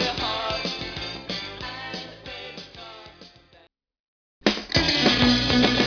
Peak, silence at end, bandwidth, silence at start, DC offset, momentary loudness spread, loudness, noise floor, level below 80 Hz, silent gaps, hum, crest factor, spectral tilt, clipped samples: -4 dBFS; 0 s; 5.4 kHz; 0 s; under 0.1%; 20 LU; -23 LUFS; -58 dBFS; -42 dBFS; 4.00-4.41 s; none; 22 dB; -4 dB/octave; under 0.1%